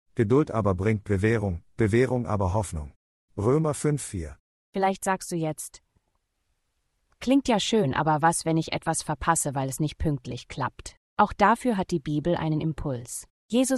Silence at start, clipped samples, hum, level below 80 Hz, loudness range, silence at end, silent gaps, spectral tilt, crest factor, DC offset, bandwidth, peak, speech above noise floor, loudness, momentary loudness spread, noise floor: 0.15 s; under 0.1%; none; -48 dBFS; 4 LU; 0 s; 2.96-3.28 s, 4.40-4.73 s, 10.97-11.17 s, 13.30-13.49 s; -5.5 dB/octave; 22 dB; under 0.1%; 12.5 kHz; -4 dBFS; 50 dB; -26 LUFS; 14 LU; -75 dBFS